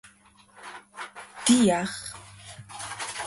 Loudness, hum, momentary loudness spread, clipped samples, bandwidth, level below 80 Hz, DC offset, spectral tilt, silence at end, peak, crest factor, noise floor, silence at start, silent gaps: -25 LUFS; none; 23 LU; under 0.1%; 11.5 kHz; -62 dBFS; under 0.1%; -3.5 dB/octave; 0 s; -8 dBFS; 22 dB; -57 dBFS; 0.05 s; none